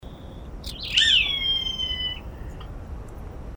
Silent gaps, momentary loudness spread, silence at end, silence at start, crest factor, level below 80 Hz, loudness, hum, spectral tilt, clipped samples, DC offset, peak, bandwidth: none; 23 LU; 0 s; 0 s; 24 dB; -38 dBFS; -21 LUFS; none; -1.5 dB/octave; under 0.1%; under 0.1%; -4 dBFS; over 20 kHz